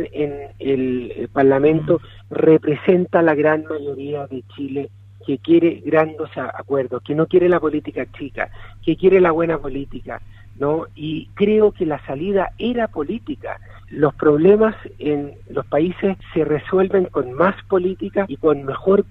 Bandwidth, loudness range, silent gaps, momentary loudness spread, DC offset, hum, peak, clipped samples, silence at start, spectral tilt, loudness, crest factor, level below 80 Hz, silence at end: 4.1 kHz; 4 LU; none; 14 LU; under 0.1%; none; -2 dBFS; under 0.1%; 0 s; -9.5 dB/octave; -19 LUFS; 16 dB; -44 dBFS; 0.05 s